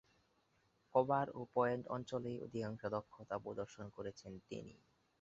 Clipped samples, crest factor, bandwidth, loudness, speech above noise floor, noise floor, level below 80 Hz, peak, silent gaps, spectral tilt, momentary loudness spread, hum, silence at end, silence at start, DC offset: under 0.1%; 24 dB; 7.6 kHz; -42 LUFS; 36 dB; -78 dBFS; -74 dBFS; -20 dBFS; none; -6 dB/octave; 13 LU; none; 0.45 s; 0.95 s; under 0.1%